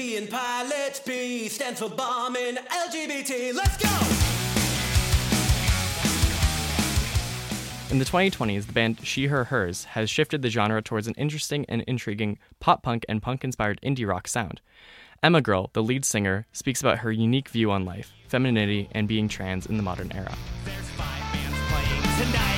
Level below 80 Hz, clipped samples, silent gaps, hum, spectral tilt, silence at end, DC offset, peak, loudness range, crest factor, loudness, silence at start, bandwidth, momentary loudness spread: -36 dBFS; under 0.1%; none; none; -4.5 dB/octave; 0 s; under 0.1%; -2 dBFS; 4 LU; 22 dB; -26 LUFS; 0 s; 17 kHz; 8 LU